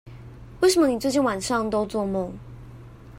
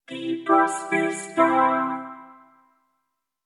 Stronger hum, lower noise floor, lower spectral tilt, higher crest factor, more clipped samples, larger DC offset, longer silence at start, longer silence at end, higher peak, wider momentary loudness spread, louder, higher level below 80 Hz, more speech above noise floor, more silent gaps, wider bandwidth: neither; second, -43 dBFS vs -78 dBFS; about the same, -4.5 dB/octave vs -4 dB/octave; about the same, 16 dB vs 20 dB; neither; neither; about the same, 0.05 s vs 0.1 s; second, 0 s vs 1.15 s; second, -10 dBFS vs -6 dBFS; first, 24 LU vs 11 LU; about the same, -23 LUFS vs -22 LUFS; first, -48 dBFS vs -88 dBFS; second, 21 dB vs 56 dB; neither; first, 16 kHz vs 11.5 kHz